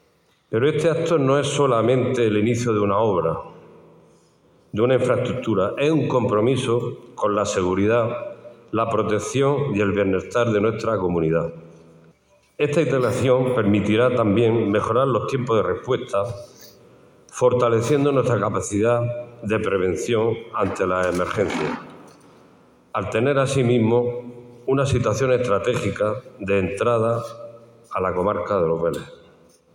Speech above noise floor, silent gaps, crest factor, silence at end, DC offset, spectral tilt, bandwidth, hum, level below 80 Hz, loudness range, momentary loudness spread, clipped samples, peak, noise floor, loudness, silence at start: 41 dB; none; 16 dB; 0.6 s; under 0.1%; -6.5 dB/octave; 16.5 kHz; none; -54 dBFS; 3 LU; 9 LU; under 0.1%; -6 dBFS; -61 dBFS; -21 LUFS; 0.5 s